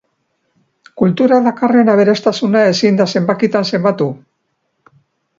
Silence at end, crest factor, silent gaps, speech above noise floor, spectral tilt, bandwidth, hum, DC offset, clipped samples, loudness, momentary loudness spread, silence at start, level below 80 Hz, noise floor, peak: 1.25 s; 14 dB; none; 55 dB; -6.5 dB/octave; 7.6 kHz; none; under 0.1%; under 0.1%; -13 LUFS; 6 LU; 0.95 s; -60 dBFS; -67 dBFS; 0 dBFS